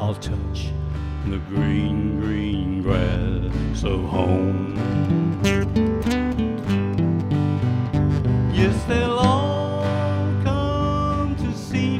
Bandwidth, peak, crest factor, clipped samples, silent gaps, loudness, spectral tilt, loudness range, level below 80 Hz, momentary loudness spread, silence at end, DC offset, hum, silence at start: 12 kHz; -4 dBFS; 18 dB; under 0.1%; none; -22 LUFS; -7.5 dB/octave; 3 LU; -32 dBFS; 6 LU; 0 s; under 0.1%; none; 0 s